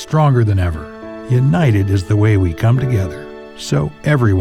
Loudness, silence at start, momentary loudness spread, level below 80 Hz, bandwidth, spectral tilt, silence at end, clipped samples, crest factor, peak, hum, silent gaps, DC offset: -15 LUFS; 0 s; 15 LU; -38 dBFS; 12.5 kHz; -7.5 dB/octave; 0 s; under 0.1%; 12 dB; -2 dBFS; none; none; under 0.1%